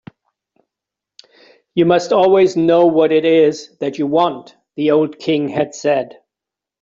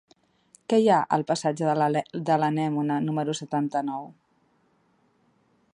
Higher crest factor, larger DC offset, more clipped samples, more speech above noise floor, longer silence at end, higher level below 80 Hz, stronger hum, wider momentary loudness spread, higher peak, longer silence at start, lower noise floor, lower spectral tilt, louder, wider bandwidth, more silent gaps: about the same, 14 dB vs 18 dB; neither; neither; first, 71 dB vs 42 dB; second, 0.75 s vs 1.65 s; first, -62 dBFS vs -74 dBFS; neither; about the same, 12 LU vs 10 LU; first, -2 dBFS vs -8 dBFS; first, 1.75 s vs 0.7 s; first, -86 dBFS vs -66 dBFS; about the same, -6 dB/octave vs -6 dB/octave; first, -15 LUFS vs -25 LUFS; second, 7.6 kHz vs 11 kHz; neither